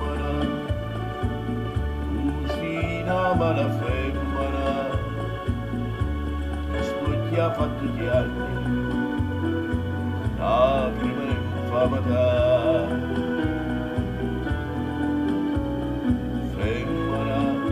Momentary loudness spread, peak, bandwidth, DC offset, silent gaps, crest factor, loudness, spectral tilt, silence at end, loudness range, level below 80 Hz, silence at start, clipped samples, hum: 7 LU; -6 dBFS; 15 kHz; under 0.1%; none; 18 dB; -25 LUFS; -8 dB/octave; 0 s; 4 LU; -34 dBFS; 0 s; under 0.1%; none